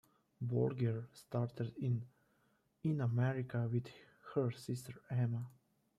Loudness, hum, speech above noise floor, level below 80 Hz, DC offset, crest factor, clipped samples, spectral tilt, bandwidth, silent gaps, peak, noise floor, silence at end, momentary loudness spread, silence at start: -39 LUFS; none; 39 dB; -74 dBFS; under 0.1%; 16 dB; under 0.1%; -8.5 dB/octave; 13 kHz; none; -24 dBFS; -77 dBFS; 0.5 s; 10 LU; 0.4 s